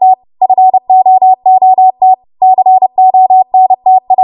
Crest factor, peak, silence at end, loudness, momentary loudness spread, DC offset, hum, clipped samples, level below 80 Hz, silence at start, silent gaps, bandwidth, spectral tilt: 6 dB; 0 dBFS; 0 s; -7 LUFS; 4 LU; under 0.1%; none; under 0.1%; -64 dBFS; 0 s; none; 1.1 kHz; -9.5 dB/octave